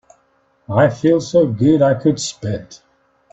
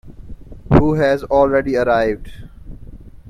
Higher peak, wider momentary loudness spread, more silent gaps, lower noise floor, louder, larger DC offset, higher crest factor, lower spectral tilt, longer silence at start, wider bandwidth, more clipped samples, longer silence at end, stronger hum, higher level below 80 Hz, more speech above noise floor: about the same, -2 dBFS vs 0 dBFS; first, 12 LU vs 5 LU; neither; first, -60 dBFS vs -36 dBFS; about the same, -16 LUFS vs -16 LUFS; neither; about the same, 16 dB vs 18 dB; second, -6.5 dB/octave vs -8.5 dB/octave; first, 0.7 s vs 0.05 s; second, 8.4 kHz vs 12.5 kHz; neither; first, 0.55 s vs 0.15 s; neither; second, -52 dBFS vs -32 dBFS; first, 44 dB vs 20 dB